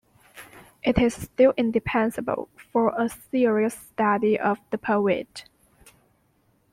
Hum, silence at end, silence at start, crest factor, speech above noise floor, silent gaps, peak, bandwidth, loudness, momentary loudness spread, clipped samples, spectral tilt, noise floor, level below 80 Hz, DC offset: none; 1.3 s; 0.35 s; 18 dB; 42 dB; none; -6 dBFS; 16 kHz; -24 LUFS; 9 LU; under 0.1%; -6 dB/octave; -65 dBFS; -48 dBFS; under 0.1%